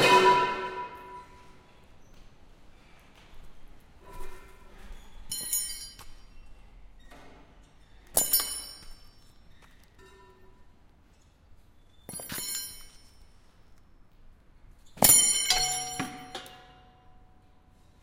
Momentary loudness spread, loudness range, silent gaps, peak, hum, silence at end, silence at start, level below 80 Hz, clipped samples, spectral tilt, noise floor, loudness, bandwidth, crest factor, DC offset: 29 LU; 16 LU; none; -6 dBFS; none; 0.9 s; 0 s; -52 dBFS; under 0.1%; -1 dB/octave; -59 dBFS; -25 LUFS; 16 kHz; 26 dB; under 0.1%